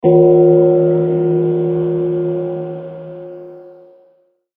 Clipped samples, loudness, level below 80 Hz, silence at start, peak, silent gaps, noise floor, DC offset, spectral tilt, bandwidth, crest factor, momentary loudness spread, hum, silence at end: under 0.1%; -14 LUFS; -56 dBFS; 0.05 s; 0 dBFS; none; -55 dBFS; under 0.1%; -14 dB/octave; 3.5 kHz; 14 dB; 21 LU; none; 0.85 s